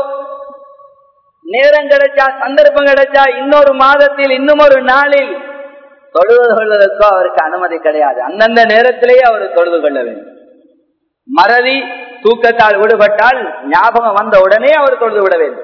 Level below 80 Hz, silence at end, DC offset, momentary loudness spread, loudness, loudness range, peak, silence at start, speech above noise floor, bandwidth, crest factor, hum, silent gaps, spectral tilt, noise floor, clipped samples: -50 dBFS; 0 s; under 0.1%; 10 LU; -9 LUFS; 3 LU; 0 dBFS; 0 s; 50 dB; 5.4 kHz; 10 dB; none; none; -4.5 dB/octave; -59 dBFS; 3%